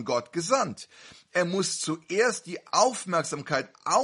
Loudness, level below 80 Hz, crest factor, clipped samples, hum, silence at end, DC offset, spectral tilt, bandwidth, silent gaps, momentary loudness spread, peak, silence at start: -27 LUFS; -72 dBFS; 20 dB; under 0.1%; none; 0 s; under 0.1%; -3 dB/octave; 11.5 kHz; none; 8 LU; -8 dBFS; 0 s